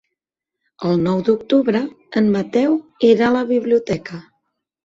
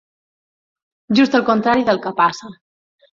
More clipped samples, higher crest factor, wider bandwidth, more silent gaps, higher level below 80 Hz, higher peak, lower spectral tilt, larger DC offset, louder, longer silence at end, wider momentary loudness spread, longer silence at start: neither; about the same, 16 dB vs 16 dB; about the same, 7.6 kHz vs 7.6 kHz; neither; about the same, -56 dBFS vs -60 dBFS; about the same, -2 dBFS vs -2 dBFS; first, -7.5 dB/octave vs -5.5 dB/octave; neither; about the same, -18 LUFS vs -16 LUFS; about the same, 0.65 s vs 0.6 s; first, 10 LU vs 5 LU; second, 0.8 s vs 1.1 s